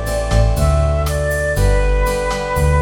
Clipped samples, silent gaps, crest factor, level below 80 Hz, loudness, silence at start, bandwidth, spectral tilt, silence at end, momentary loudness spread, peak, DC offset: under 0.1%; none; 14 dB; -18 dBFS; -17 LUFS; 0 s; 17 kHz; -5.5 dB/octave; 0 s; 3 LU; -2 dBFS; under 0.1%